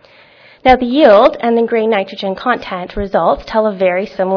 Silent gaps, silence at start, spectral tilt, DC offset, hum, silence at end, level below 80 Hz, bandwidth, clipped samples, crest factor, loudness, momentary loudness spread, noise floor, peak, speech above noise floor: none; 0.65 s; -7 dB/octave; under 0.1%; none; 0 s; -38 dBFS; 5.4 kHz; 0.4%; 14 dB; -13 LUFS; 10 LU; -44 dBFS; 0 dBFS; 31 dB